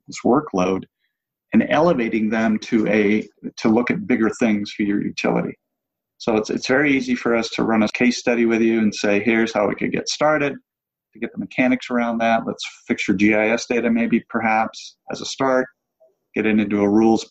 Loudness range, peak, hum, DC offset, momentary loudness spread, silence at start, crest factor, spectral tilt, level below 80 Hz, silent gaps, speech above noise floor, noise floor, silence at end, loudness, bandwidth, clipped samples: 3 LU; -4 dBFS; none; under 0.1%; 10 LU; 0.1 s; 16 dB; -5.5 dB/octave; -56 dBFS; none; 62 dB; -82 dBFS; 0.05 s; -20 LUFS; 8.2 kHz; under 0.1%